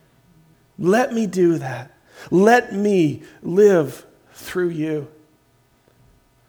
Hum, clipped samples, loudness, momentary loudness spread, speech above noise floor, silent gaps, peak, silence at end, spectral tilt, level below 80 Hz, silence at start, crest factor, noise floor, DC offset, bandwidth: none; under 0.1%; -19 LUFS; 17 LU; 41 dB; none; -2 dBFS; 1.4 s; -6.5 dB/octave; -62 dBFS; 0.8 s; 18 dB; -59 dBFS; under 0.1%; over 20 kHz